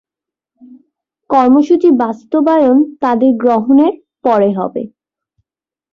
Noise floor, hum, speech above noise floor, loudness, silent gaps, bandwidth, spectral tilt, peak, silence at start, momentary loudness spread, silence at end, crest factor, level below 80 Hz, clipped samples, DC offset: -89 dBFS; none; 78 dB; -12 LUFS; none; 6.6 kHz; -8 dB/octave; -2 dBFS; 1.3 s; 10 LU; 1.05 s; 12 dB; -58 dBFS; under 0.1%; under 0.1%